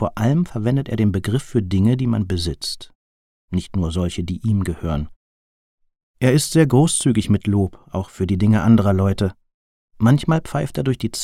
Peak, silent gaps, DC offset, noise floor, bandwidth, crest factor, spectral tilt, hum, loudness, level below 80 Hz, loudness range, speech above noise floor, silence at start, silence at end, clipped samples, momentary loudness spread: -2 dBFS; 2.95-3.48 s, 5.16-5.78 s, 6.03-6.14 s, 9.54-9.88 s; under 0.1%; under -90 dBFS; 15 kHz; 18 dB; -6 dB/octave; none; -19 LUFS; -40 dBFS; 7 LU; over 72 dB; 0 s; 0 s; under 0.1%; 10 LU